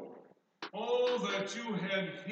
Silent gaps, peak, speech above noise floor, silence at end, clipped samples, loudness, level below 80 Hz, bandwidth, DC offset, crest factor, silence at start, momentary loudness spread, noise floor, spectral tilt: none; -20 dBFS; 22 dB; 0 s; under 0.1%; -35 LUFS; under -90 dBFS; 8.6 kHz; under 0.1%; 16 dB; 0 s; 14 LU; -59 dBFS; -4.5 dB/octave